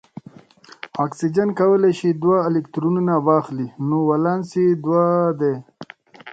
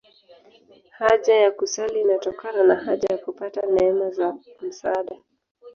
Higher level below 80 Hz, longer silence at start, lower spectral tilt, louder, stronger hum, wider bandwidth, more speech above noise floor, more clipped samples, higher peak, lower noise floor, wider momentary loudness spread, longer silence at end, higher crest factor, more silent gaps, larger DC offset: about the same, -64 dBFS vs -62 dBFS; second, 0.85 s vs 1 s; first, -8.5 dB/octave vs -3.5 dB/octave; first, -19 LUFS vs -22 LUFS; neither; first, 8.8 kHz vs 7.2 kHz; second, 28 dB vs 32 dB; neither; about the same, -2 dBFS vs -4 dBFS; second, -47 dBFS vs -53 dBFS; about the same, 11 LU vs 12 LU; about the same, 0 s vs 0.05 s; about the same, 16 dB vs 18 dB; second, none vs 5.51-5.55 s; neither